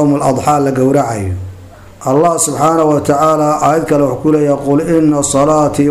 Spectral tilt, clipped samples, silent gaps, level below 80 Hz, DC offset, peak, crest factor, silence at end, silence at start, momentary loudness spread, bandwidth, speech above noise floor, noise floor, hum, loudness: -6 dB/octave; under 0.1%; none; -42 dBFS; 0.3%; -2 dBFS; 10 dB; 0 s; 0 s; 6 LU; 15.5 kHz; 23 dB; -34 dBFS; none; -12 LUFS